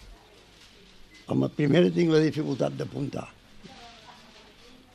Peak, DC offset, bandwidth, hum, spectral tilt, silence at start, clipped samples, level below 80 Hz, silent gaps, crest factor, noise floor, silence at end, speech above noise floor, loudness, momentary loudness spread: -10 dBFS; under 0.1%; 12 kHz; none; -7.5 dB/octave; 0.05 s; under 0.1%; -58 dBFS; none; 20 dB; -54 dBFS; 0.85 s; 29 dB; -25 LUFS; 25 LU